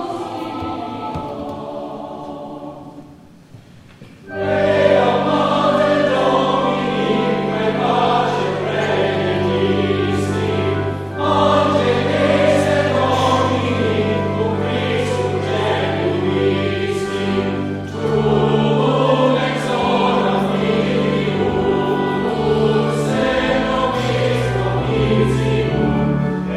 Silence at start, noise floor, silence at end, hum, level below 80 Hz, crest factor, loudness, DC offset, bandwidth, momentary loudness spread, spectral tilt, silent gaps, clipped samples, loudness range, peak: 0 s; -42 dBFS; 0 s; none; -40 dBFS; 16 dB; -17 LUFS; under 0.1%; 12.5 kHz; 11 LU; -6.5 dB/octave; none; under 0.1%; 4 LU; -2 dBFS